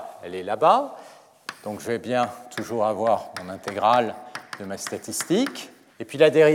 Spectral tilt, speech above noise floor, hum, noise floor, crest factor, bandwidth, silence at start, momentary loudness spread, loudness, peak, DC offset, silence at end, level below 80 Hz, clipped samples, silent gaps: -4.5 dB/octave; 19 dB; none; -42 dBFS; 20 dB; 17 kHz; 0 s; 18 LU; -24 LUFS; -4 dBFS; under 0.1%; 0 s; -76 dBFS; under 0.1%; none